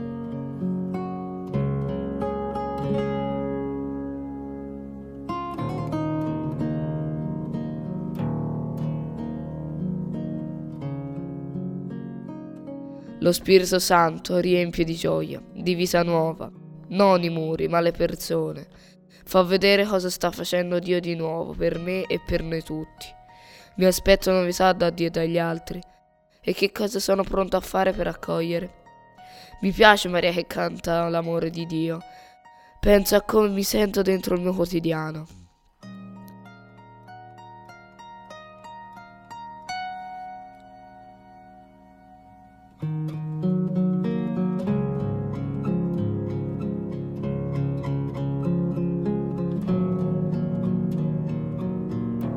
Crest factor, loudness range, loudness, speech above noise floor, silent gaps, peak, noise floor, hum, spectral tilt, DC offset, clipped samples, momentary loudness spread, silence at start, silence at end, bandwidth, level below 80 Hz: 24 dB; 16 LU; -25 LUFS; 38 dB; none; 0 dBFS; -60 dBFS; none; -5.5 dB/octave; under 0.1%; under 0.1%; 19 LU; 0 s; 0 s; 17.5 kHz; -44 dBFS